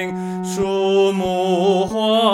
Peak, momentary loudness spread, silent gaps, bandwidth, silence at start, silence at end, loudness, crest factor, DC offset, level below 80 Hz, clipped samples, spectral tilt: -2 dBFS; 8 LU; none; 13.5 kHz; 0 s; 0 s; -18 LUFS; 16 dB; under 0.1%; -50 dBFS; under 0.1%; -5.5 dB/octave